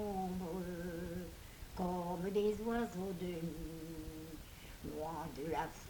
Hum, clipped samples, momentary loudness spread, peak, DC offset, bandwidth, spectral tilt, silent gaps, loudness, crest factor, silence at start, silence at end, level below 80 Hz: none; under 0.1%; 14 LU; -26 dBFS; under 0.1%; 19 kHz; -6.5 dB/octave; none; -42 LUFS; 16 dB; 0 s; 0 s; -56 dBFS